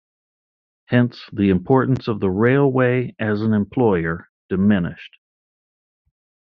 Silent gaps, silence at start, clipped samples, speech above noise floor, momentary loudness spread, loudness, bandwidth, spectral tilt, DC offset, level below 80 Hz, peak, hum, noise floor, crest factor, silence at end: 4.29-4.49 s; 0.9 s; under 0.1%; over 72 dB; 9 LU; -19 LUFS; 5.6 kHz; -7 dB/octave; under 0.1%; -54 dBFS; -2 dBFS; none; under -90 dBFS; 18 dB; 1.4 s